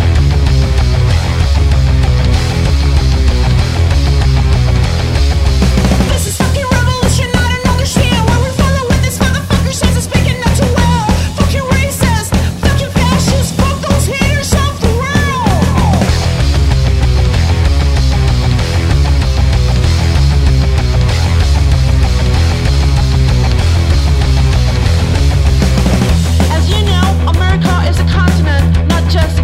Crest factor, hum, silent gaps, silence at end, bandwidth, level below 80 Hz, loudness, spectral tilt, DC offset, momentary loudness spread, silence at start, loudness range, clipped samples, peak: 10 dB; none; none; 0 s; 15 kHz; -14 dBFS; -11 LUFS; -5.5 dB/octave; under 0.1%; 2 LU; 0 s; 1 LU; under 0.1%; 0 dBFS